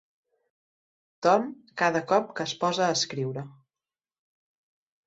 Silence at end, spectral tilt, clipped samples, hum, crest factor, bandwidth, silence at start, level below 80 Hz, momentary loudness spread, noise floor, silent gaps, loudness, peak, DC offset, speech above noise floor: 1.55 s; -4 dB/octave; under 0.1%; none; 22 dB; 8.2 kHz; 1.2 s; -74 dBFS; 11 LU; under -90 dBFS; none; -26 LUFS; -8 dBFS; under 0.1%; over 64 dB